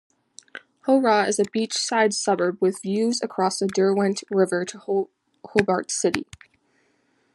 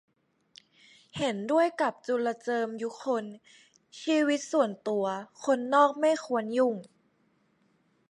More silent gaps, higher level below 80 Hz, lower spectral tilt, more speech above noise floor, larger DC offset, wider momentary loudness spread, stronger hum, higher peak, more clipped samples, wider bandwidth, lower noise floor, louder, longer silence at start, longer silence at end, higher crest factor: neither; first, -66 dBFS vs -76 dBFS; about the same, -4 dB/octave vs -4.5 dB/octave; about the same, 44 dB vs 42 dB; neither; about the same, 10 LU vs 10 LU; neither; first, -2 dBFS vs -10 dBFS; neither; about the same, 12 kHz vs 11.5 kHz; second, -66 dBFS vs -70 dBFS; first, -23 LUFS vs -28 LUFS; second, 0.55 s vs 1.15 s; second, 1.1 s vs 1.25 s; about the same, 22 dB vs 20 dB